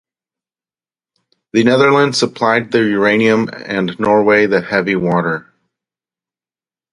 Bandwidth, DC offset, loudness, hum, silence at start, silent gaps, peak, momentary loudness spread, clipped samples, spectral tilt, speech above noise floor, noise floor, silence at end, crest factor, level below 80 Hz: 11.5 kHz; under 0.1%; -14 LUFS; none; 1.55 s; none; 0 dBFS; 9 LU; under 0.1%; -5.5 dB/octave; over 77 dB; under -90 dBFS; 1.5 s; 16 dB; -56 dBFS